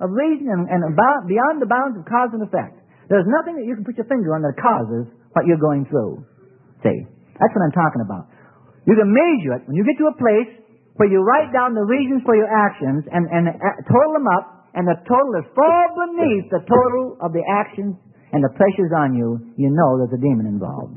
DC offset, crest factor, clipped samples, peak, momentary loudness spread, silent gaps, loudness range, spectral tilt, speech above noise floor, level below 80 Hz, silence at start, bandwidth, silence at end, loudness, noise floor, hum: under 0.1%; 18 dB; under 0.1%; 0 dBFS; 10 LU; none; 3 LU; -13 dB/octave; 32 dB; -62 dBFS; 0 s; 3.3 kHz; 0 s; -18 LUFS; -50 dBFS; none